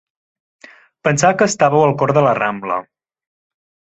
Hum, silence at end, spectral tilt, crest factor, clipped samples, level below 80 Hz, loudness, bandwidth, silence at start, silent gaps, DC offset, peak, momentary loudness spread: none; 1.15 s; -5 dB/octave; 16 dB; under 0.1%; -56 dBFS; -15 LUFS; 8.2 kHz; 1.05 s; none; under 0.1%; 0 dBFS; 10 LU